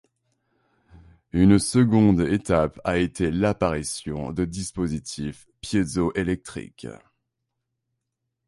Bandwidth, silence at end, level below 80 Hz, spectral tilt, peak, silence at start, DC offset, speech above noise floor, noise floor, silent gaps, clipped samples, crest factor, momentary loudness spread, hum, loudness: 11.5 kHz; 1.5 s; -44 dBFS; -6 dB/octave; -4 dBFS; 1.35 s; under 0.1%; 58 dB; -81 dBFS; none; under 0.1%; 20 dB; 17 LU; none; -23 LUFS